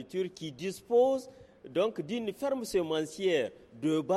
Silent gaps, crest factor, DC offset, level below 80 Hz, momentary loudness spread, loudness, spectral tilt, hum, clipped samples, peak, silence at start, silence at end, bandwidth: none; 16 dB; under 0.1%; -68 dBFS; 11 LU; -32 LUFS; -5 dB/octave; none; under 0.1%; -16 dBFS; 0 s; 0 s; 14 kHz